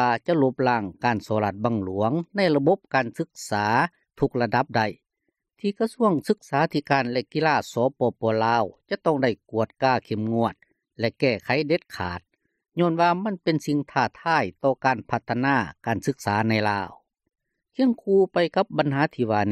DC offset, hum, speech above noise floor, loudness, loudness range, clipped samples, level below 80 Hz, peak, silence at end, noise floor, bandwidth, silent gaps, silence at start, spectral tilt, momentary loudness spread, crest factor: under 0.1%; none; 55 dB; -24 LUFS; 2 LU; under 0.1%; -62 dBFS; -6 dBFS; 0 s; -78 dBFS; 14 kHz; none; 0 s; -6.5 dB/octave; 7 LU; 18 dB